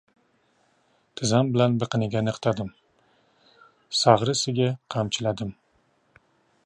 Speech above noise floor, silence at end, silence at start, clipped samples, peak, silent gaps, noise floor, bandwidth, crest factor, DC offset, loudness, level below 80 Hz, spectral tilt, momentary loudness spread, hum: 43 dB; 1.15 s; 1.15 s; under 0.1%; -2 dBFS; none; -66 dBFS; 10.5 kHz; 24 dB; under 0.1%; -24 LUFS; -60 dBFS; -5 dB/octave; 13 LU; none